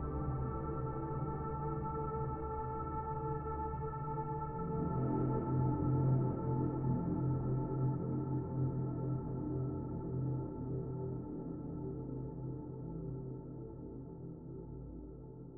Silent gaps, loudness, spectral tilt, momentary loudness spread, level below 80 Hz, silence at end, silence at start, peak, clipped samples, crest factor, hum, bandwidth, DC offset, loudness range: none; -39 LUFS; -9.5 dB/octave; 13 LU; -50 dBFS; 0 s; 0 s; -22 dBFS; under 0.1%; 16 dB; none; 2.3 kHz; under 0.1%; 9 LU